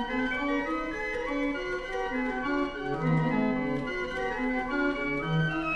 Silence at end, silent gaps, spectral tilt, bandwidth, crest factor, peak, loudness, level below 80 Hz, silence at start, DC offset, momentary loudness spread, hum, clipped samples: 0 s; none; -7 dB/octave; 9.2 kHz; 14 dB; -16 dBFS; -30 LUFS; -46 dBFS; 0 s; under 0.1%; 5 LU; none; under 0.1%